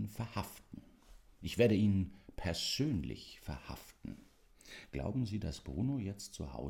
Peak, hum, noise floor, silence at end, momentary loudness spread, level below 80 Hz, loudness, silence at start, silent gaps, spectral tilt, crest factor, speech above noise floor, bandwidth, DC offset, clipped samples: -16 dBFS; none; -62 dBFS; 0 s; 20 LU; -54 dBFS; -37 LUFS; 0 s; none; -6 dB/octave; 22 dB; 25 dB; 17.5 kHz; under 0.1%; under 0.1%